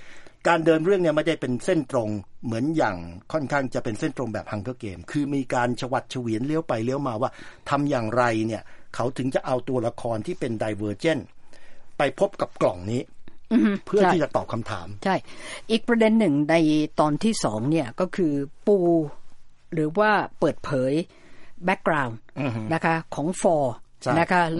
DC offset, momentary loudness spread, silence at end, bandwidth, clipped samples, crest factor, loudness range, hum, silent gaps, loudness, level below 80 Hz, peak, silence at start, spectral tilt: under 0.1%; 11 LU; 0 s; 11.5 kHz; under 0.1%; 20 dB; 5 LU; none; none; -24 LUFS; -52 dBFS; -4 dBFS; 0 s; -6 dB/octave